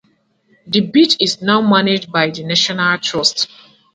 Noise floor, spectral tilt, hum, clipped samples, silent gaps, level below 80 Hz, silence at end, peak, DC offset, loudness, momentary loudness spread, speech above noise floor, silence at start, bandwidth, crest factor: -59 dBFS; -4 dB/octave; none; under 0.1%; none; -60 dBFS; 0.5 s; 0 dBFS; under 0.1%; -14 LUFS; 6 LU; 44 dB; 0.65 s; 9.4 kHz; 16 dB